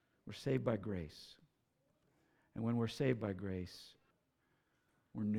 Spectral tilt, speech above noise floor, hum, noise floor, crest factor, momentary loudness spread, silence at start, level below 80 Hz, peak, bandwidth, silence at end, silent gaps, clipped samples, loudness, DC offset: -7.5 dB/octave; 40 dB; none; -80 dBFS; 22 dB; 19 LU; 0.25 s; -68 dBFS; -22 dBFS; 14.5 kHz; 0 s; none; under 0.1%; -40 LUFS; under 0.1%